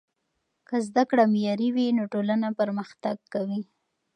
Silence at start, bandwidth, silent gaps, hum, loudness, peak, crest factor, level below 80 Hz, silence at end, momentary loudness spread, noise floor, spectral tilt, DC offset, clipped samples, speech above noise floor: 0.7 s; 9.6 kHz; none; none; -26 LUFS; -8 dBFS; 18 dB; -78 dBFS; 0.55 s; 11 LU; -78 dBFS; -7 dB/octave; under 0.1%; under 0.1%; 53 dB